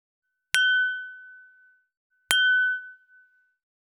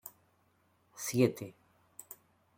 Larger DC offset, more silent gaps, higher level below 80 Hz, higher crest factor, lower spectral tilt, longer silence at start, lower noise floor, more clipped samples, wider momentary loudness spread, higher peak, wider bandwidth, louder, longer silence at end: neither; first, 1.97-2.10 s vs none; second, -84 dBFS vs -76 dBFS; about the same, 28 dB vs 26 dB; second, 3 dB/octave vs -5.5 dB/octave; first, 0.55 s vs 0.05 s; second, -60 dBFS vs -72 dBFS; neither; second, 17 LU vs 24 LU; first, -2 dBFS vs -12 dBFS; about the same, 15.5 kHz vs 16.5 kHz; first, -23 LUFS vs -32 LUFS; about the same, 0.95 s vs 1.05 s